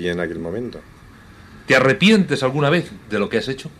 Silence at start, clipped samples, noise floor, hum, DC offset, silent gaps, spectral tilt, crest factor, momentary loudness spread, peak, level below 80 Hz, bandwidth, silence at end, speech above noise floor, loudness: 0 s; under 0.1%; -43 dBFS; none; under 0.1%; none; -5.5 dB/octave; 18 dB; 14 LU; -2 dBFS; -50 dBFS; 14 kHz; 0.05 s; 25 dB; -18 LUFS